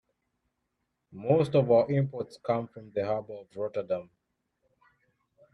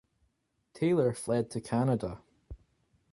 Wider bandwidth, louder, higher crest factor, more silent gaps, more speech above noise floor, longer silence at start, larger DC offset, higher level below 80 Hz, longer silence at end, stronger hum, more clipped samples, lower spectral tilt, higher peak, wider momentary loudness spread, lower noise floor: about the same, 10.5 kHz vs 11.5 kHz; about the same, -29 LUFS vs -31 LUFS; about the same, 20 dB vs 16 dB; neither; first, 53 dB vs 47 dB; first, 1.15 s vs 0.75 s; neither; second, -68 dBFS vs -58 dBFS; first, 1.5 s vs 0.55 s; neither; neither; first, -9 dB/octave vs -7 dB/octave; first, -12 dBFS vs -16 dBFS; first, 13 LU vs 9 LU; first, -81 dBFS vs -76 dBFS